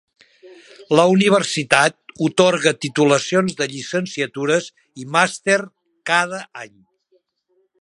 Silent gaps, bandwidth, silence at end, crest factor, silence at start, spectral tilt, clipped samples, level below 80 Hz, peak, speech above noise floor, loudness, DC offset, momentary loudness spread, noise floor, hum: none; 11.5 kHz; 1.15 s; 20 dB; 0.45 s; -4 dB/octave; under 0.1%; -66 dBFS; 0 dBFS; 47 dB; -18 LUFS; under 0.1%; 17 LU; -66 dBFS; none